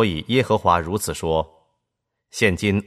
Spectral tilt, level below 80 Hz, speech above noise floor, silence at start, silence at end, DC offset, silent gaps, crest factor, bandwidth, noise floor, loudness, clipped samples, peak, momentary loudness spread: -5 dB/octave; -44 dBFS; 59 dB; 0 s; 0.05 s; under 0.1%; none; 18 dB; 15 kHz; -79 dBFS; -21 LUFS; under 0.1%; -2 dBFS; 8 LU